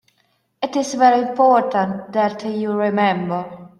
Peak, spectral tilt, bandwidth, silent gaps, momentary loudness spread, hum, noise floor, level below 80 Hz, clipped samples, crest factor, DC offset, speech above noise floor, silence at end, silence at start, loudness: -2 dBFS; -5.5 dB/octave; 11.5 kHz; none; 9 LU; none; -65 dBFS; -66 dBFS; under 0.1%; 16 dB; under 0.1%; 47 dB; 0.15 s; 0.6 s; -18 LUFS